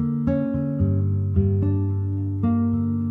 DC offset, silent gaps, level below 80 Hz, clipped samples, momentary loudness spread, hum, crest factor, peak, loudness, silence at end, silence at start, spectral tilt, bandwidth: under 0.1%; none; -44 dBFS; under 0.1%; 3 LU; none; 14 dB; -8 dBFS; -23 LUFS; 0 s; 0 s; -13 dB/octave; 2.9 kHz